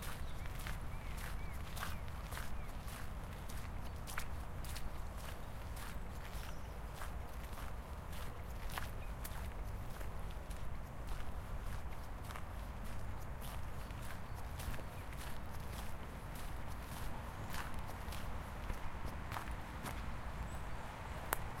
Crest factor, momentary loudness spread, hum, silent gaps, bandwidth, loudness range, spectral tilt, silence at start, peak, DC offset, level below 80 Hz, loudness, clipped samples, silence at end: 30 dB; 3 LU; none; none; 16.5 kHz; 2 LU; -4.5 dB/octave; 0 s; -14 dBFS; under 0.1%; -48 dBFS; -48 LUFS; under 0.1%; 0 s